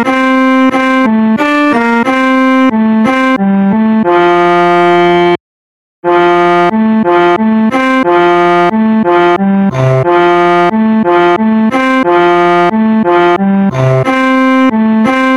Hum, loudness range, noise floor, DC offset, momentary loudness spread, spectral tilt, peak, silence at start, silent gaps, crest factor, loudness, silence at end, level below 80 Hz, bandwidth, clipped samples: none; 1 LU; under -90 dBFS; 0.4%; 2 LU; -7 dB/octave; 0 dBFS; 0 s; 5.40-6.03 s; 8 dB; -8 LUFS; 0 s; -48 dBFS; 11 kHz; 0.9%